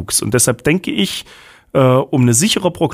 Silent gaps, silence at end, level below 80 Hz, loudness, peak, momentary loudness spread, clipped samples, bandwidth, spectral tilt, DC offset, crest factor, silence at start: none; 0 s; -46 dBFS; -14 LUFS; 0 dBFS; 7 LU; under 0.1%; 15.5 kHz; -4 dB/octave; under 0.1%; 16 dB; 0 s